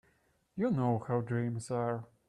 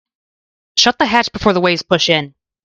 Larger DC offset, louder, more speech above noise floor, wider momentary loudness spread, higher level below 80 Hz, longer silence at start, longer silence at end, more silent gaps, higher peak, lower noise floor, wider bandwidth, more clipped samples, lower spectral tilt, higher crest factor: neither; second, -34 LUFS vs -14 LUFS; second, 39 dB vs over 75 dB; about the same, 5 LU vs 5 LU; second, -70 dBFS vs -46 dBFS; second, 0.55 s vs 0.75 s; about the same, 0.25 s vs 0.35 s; neither; second, -18 dBFS vs 0 dBFS; second, -72 dBFS vs under -90 dBFS; about the same, 11 kHz vs 11 kHz; neither; first, -8 dB/octave vs -3.5 dB/octave; about the same, 16 dB vs 16 dB